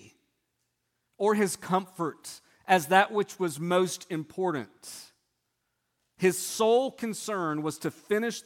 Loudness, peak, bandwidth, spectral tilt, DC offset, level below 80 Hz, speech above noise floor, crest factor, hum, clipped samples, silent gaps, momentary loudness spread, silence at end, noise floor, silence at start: -28 LUFS; -6 dBFS; 17.5 kHz; -4.5 dB/octave; under 0.1%; -76 dBFS; 52 dB; 24 dB; none; under 0.1%; none; 18 LU; 0.05 s; -79 dBFS; 1.2 s